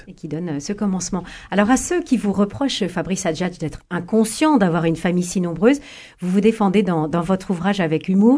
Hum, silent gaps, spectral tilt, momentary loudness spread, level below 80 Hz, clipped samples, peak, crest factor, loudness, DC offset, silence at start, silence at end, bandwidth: none; none; -5.5 dB/octave; 10 LU; -46 dBFS; under 0.1%; -2 dBFS; 18 dB; -20 LUFS; under 0.1%; 0.05 s; 0 s; 11 kHz